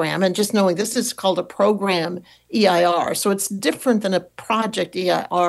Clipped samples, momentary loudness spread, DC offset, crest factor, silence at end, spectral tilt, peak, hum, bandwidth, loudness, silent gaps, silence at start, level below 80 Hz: under 0.1%; 6 LU; under 0.1%; 14 dB; 0 s; -4 dB/octave; -6 dBFS; none; 13 kHz; -20 LUFS; none; 0 s; -66 dBFS